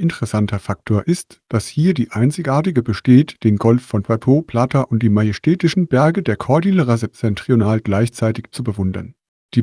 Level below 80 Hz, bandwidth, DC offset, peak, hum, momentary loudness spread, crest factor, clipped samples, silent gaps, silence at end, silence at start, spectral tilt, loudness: -50 dBFS; 11 kHz; under 0.1%; 0 dBFS; none; 8 LU; 16 dB; under 0.1%; 9.28-9.49 s; 0 s; 0 s; -7.5 dB/octave; -17 LUFS